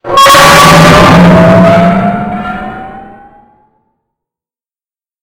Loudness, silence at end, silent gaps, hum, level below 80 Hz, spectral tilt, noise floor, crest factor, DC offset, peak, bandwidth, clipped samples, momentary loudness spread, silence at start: -3 LUFS; 2.2 s; none; none; -28 dBFS; -5 dB/octave; under -90 dBFS; 6 dB; under 0.1%; 0 dBFS; over 20 kHz; 9%; 17 LU; 0.05 s